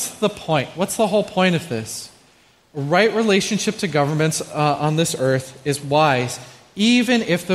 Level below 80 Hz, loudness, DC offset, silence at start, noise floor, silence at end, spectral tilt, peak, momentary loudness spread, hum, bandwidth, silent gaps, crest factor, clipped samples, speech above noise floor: -58 dBFS; -19 LUFS; under 0.1%; 0 s; -54 dBFS; 0 s; -4.5 dB/octave; -2 dBFS; 11 LU; none; 15 kHz; none; 18 dB; under 0.1%; 35 dB